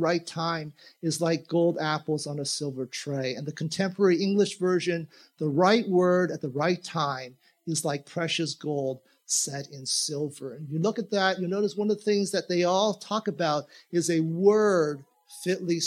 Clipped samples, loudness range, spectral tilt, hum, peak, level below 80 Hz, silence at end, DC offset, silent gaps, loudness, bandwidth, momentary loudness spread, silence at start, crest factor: under 0.1%; 4 LU; -4.5 dB/octave; none; -8 dBFS; -80 dBFS; 0 s; under 0.1%; none; -27 LUFS; 15.5 kHz; 11 LU; 0 s; 20 dB